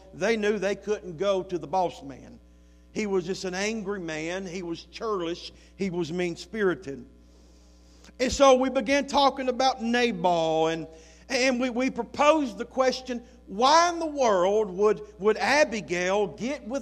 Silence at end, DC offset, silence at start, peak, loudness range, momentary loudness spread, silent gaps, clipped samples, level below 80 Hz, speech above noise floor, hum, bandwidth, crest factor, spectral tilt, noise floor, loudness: 0 s; under 0.1%; 0.15 s; -6 dBFS; 8 LU; 13 LU; none; under 0.1%; -54 dBFS; 28 dB; none; 13 kHz; 20 dB; -4 dB/octave; -54 dBFS; -26 LUFS